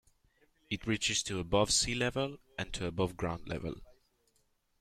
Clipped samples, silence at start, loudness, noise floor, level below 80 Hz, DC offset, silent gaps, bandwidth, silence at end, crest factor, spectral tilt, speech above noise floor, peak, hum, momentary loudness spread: under 0.1%; 0.7 s; -33 LUFS; -75 dBFS; -52 dBFS; under 0.1%; none; 14.5 kHz; 0.85 s; 20 dB; -3 dB/octave; 41 dB; -16 dBFS; none; 13 LU